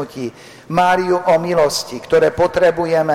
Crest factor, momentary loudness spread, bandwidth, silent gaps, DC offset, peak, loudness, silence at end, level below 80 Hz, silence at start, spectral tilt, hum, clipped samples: 10 dB; 10 LU; 15.5 kHz; none; under 0.1%; -6 dBFS; -15 LUFS; 0 s; -46 dBFS; 0 s; -4.5 dB/octave; none; under 0.1%